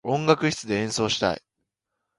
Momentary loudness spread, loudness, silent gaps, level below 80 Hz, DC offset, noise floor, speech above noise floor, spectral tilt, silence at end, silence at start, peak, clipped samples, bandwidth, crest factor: 6 LU; -24 LUFS; none; -56 dBFS; under 0.1%; -82 dBFS; 58 dB; -4.5 dB/octave; 0.8 s; 0.05 s; -4 dBFS; under 0.1%; 11.5 kHz; 22 dB